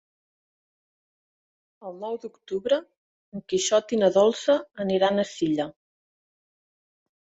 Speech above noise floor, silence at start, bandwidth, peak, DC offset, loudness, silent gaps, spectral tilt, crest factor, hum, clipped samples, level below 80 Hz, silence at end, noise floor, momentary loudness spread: over 66 dB; 1.8 s; 8.2 kHz; -8 dBFS; under 0.1%; -24 LUFS; 2.97-3.32 s; -4 dB/octave; 20 dB; none; under 0.1%; -70 dBFS; 1.5 s; under -90 dBFS; 16 LU